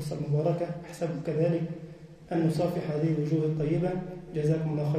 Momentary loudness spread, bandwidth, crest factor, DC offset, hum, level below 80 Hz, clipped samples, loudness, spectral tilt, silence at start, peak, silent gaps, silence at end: 9 LU; 13.5 kHz; 14 dB; under 0.1%; none; -58 dBFS; under 0.1%; -29 LUFS; -8.5 dB/octave; 0 s; -14 dBFS; none; 0 s